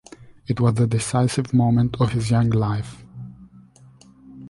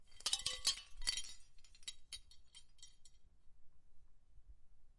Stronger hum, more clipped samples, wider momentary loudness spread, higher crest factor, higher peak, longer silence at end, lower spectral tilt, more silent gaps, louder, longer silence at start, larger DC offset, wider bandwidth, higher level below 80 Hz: neither; neither; second, 20 LU vs 24 LU; second, 16 dB vs 30 dB; first, -6 dBFS vs -18 dBFS; about the same, 0 s vs 0.05 s; first, -7 dB/octave vs 1.5 dB/octave; neither; first, -21 LUFS vs -41 LUFS; first, 0.2 s vs 0 s; neither; about the same, 11.5 kHz vs 11.5 kHz; first, -46 dBFS vs -60 dBFS